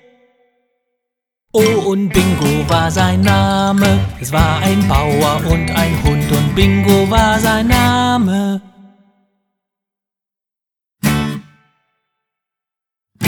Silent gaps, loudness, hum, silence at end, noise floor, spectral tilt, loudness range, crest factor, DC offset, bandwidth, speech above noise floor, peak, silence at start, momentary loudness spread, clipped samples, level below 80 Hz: none; -14 LUFS; none; 0 s; -87 dBFS; -5.5 dB/octave; 12 LU; 16 dB; under 0.1%; over 20 kHz; 74 dB; 0 dBFS; 1.55 s; 6 LU; under 0.1%; -28 dBFS